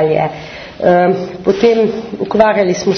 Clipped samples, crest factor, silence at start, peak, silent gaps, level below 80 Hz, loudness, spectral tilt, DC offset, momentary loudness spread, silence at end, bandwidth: under 0.1%; 12 dB; 0 s; 0 dBFS; none; -46 dBFS; -13 LUFS; -6 dB/octave; under 0.1%; 10 LU; 0 s; 6.6 kHz